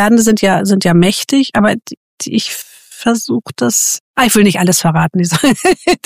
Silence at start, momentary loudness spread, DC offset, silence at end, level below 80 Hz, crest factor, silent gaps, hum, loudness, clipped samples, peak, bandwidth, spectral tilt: 0 s; 10 LU; 0.5%; 0.1 s; -44 dBFS; 12 dB; 1.97-2.18 s, 4.00-4.14 s; none; -12 LUFS; under 0.1%; 0 dBFS; 15.5 kHz; -4 dB/octave